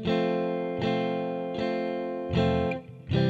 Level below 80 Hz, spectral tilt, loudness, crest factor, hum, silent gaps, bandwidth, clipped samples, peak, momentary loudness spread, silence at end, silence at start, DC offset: -48 dBFS; -8 dB/octave; -29 LUFS; 14 dB; none; none; 7.8 kHz; under 0.1%; -12 dBFS; 6 LU; 0 s; 0 s; under 0.1%